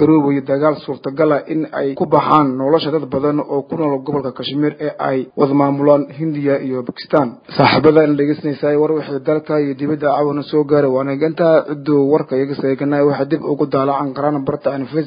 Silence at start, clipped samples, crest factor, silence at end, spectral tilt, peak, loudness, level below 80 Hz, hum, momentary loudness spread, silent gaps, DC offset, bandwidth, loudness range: 0 s; under 0.1%; 16 dB; 0 s; -10 dB/octave; 0 dBFS; -16 LUFS; -56 dBFS; none; 7 LU; none; under 0.1%; 5.2 kHz; 2 LU